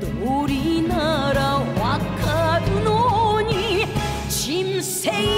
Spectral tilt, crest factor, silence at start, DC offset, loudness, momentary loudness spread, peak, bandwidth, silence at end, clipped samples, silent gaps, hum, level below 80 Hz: -5 dB/octave; 12 dB; 0 s; under 0.1%; -21 LUFS; 4 LU; -8 dBFS; 16 kHz; 0 s; under 0.1%; none; none; -34 dBFS